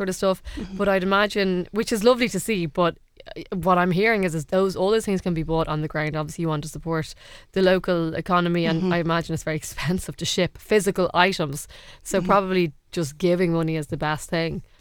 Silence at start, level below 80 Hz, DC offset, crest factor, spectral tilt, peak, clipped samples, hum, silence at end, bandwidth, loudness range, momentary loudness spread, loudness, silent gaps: 0 s; -44 dBFS; under 0.1%; 22 dB; -5.5 dB/octave; 0 dBFS; under 0.1%; none; 0.15 s; 19 kHz; 2 LU; 9 LU; -23 LUFS; none